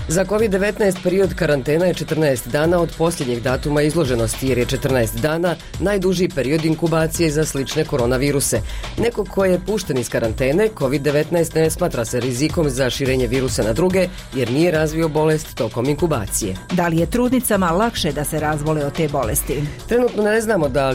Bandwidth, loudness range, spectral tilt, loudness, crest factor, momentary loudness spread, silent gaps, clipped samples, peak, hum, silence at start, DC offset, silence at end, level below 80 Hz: 16.5 kHz; 1 LU; -5 dB/octave; -19 LUFS; 12 dB; 4 LU; none; under 0.1%; -8 dBFS; none; 0 s; under 0.1%; 0 s; -34 dBFS